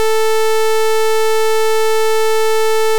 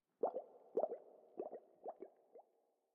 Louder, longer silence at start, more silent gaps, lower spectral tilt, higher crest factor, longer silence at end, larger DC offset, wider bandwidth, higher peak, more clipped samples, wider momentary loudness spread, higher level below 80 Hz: first, -14 LUFS vs -47 LUFS; second, 0 s vs 0.25 s; neither; second, -0.5 dB/octave vs -3 dB/octave; second, 6 dB vs 22 dB; second, 0 s vs 0.55 s; first, 20% vs under 0.1%; first, over 20 kHz vs 3.1 kHz; first, -6 dBFS vs -26 dBFS; neither; second, 0 LU vs 21 LU; first, -80 dBFS vs under -90 dBFS